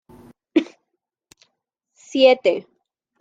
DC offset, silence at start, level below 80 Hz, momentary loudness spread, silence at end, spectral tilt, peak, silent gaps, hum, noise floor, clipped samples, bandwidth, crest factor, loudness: under 0.1%; 0.55 s; -70 dBFS; 14 LU; 0.6 s; -4 dB/octave; -2 dBFS; none; none; -78 dBFS; under 0.1%; 7.8 kHz; 20 dB; -19 LUFS